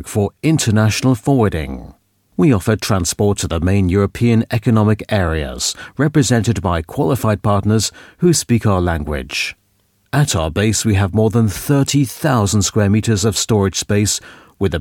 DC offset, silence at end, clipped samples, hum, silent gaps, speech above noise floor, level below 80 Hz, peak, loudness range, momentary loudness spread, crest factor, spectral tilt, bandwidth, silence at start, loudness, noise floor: under 0.1%; 0 s; under 0.1%; none; none; 45 dB; -36 dBFS; -2 dBFS; 2 LU; 6 LU; 14 dB; -5 dB/octave; 17.5 kHz; 0 s; -16 LUFS; -60 dBFS